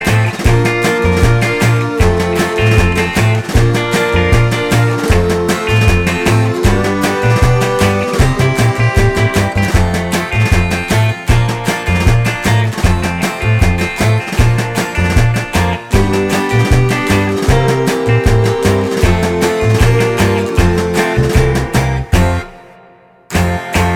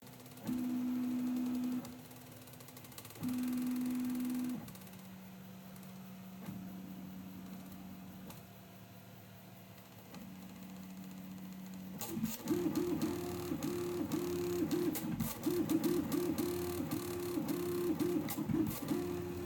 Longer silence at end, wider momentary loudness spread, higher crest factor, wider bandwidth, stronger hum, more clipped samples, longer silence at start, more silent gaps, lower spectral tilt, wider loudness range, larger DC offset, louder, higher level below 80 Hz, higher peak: about the same, 0 s vs 0 s; second, 3 LU vs 16 LU; second, 12 dB vs 18 dB; about the same, 16.5 kHz vs 17.5 kHz; neither; neither; about the same, 0 s vs 0 s; neither; about the same, -6 dB/octave vs -5.5 dB/octave; second, 1 LU vs 15 LU; neither; first, -13 LUFS vs -39 LUFS; first, -20 dBFS vs -68 dBFS; first, 0 dBFS vs -22 dBFS